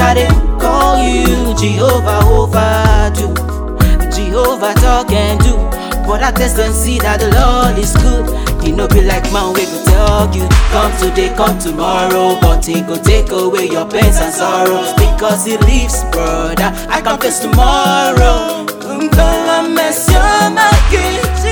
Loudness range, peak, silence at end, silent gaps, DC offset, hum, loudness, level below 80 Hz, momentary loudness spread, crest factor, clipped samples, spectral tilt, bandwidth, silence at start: 2 LU; 0 dBFS; 0 s; none; under 0.1%; none; -12 LUFS; -14 dBFS; 5 LU; 10 dB; 0.6%; -5 dB/octave; over 20 kHz; 0 s